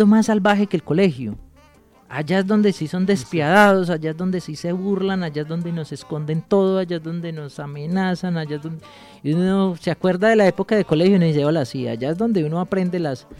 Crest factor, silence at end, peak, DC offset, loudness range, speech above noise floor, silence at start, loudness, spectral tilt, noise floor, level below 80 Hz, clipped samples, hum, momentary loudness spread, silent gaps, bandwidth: 20 dB; 0.05 s; 0 dBFS; under 0.1%; 5 LU; 32 dB; 0 s; -20 LUFS; -7 dB/octave; -52 dBFS; -54 dBFS; under 0.1%; none; 14 LU; none; 13 kHz